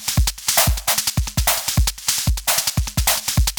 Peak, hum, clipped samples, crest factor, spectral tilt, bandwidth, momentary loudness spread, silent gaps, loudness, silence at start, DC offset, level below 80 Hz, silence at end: -2 dBFS; none; under 0.1%; 16 dB; -2.5 dB/octave; over 20 kHz; 4 LU; none; -18 LUFS; 0 s; under 0.1%; -24 dBFS; 0 s